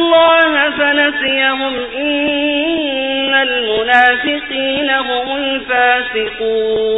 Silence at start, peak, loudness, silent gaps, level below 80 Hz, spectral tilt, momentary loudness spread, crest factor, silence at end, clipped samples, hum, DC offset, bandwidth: 0 s; 0 dBFS; -13 LUFS; none; -46 dBFS; 1 dB/octave; 8 LU; 14 dB; 0 s; under 0.1%; none; under 0.1%; 6.4 kHz